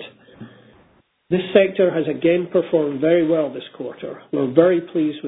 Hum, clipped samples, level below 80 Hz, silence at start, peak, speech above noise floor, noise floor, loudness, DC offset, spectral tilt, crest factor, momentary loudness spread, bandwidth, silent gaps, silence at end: none; under 0.1%; -62 dBFS; 0 s; 0 dBFS; 39 dB; -57 dBFS; -19 LUFS; under 0.1%; -11 dB/octave; 20 dB; 15 LU; 4 kHz; none; 0 s